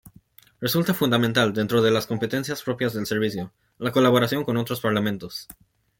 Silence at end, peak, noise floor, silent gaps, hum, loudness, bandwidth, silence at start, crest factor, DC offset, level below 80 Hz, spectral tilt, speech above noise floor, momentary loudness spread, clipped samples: 0.45 s; -6 dBFS; -54 dBFS; none; none; -23 LUFS; 17 kHz; 0.05 s; 18 dB; under 0.1%; -60 dBFS; -5.5 dB/octave; 31 dB; 11 LU; under 0.1%